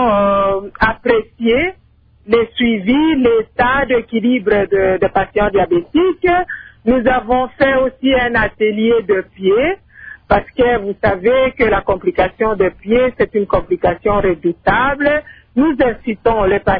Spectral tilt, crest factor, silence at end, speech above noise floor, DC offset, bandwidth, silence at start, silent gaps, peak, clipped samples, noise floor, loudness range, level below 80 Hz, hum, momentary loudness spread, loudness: -9.5 dB/octave; 14 dB; 0 s; 36 dB; under 0.1%; 5.2 kHz; 0 s; none; 0 dBFS; under 0.1%; -50 dBFS; 1 LU; -34 dBFS; none; 4 LU; -15 LUFS